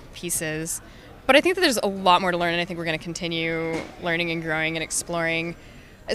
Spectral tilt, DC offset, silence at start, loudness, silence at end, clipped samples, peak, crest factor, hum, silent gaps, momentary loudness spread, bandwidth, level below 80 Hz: -3 dB/octave; under 0.1%; 0 s; -23 LUFS; 0 s; under 0.1%; -2 dBFS; 22 dB; none; none; 11 LU; 15.5 kHz; -50 dBFS